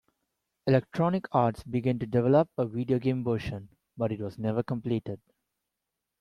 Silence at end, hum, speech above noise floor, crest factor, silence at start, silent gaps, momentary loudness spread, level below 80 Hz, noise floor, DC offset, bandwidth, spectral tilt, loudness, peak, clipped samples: 1.05 s; none; 58 dB; 20 dB; 0.65 s; none; 10 LU; -60 dBFS; -86 dBFS; under 0.1%; 11.5 kHz; -9 dB/octave; -29 LUFS; -10 dBFS; under 0.1%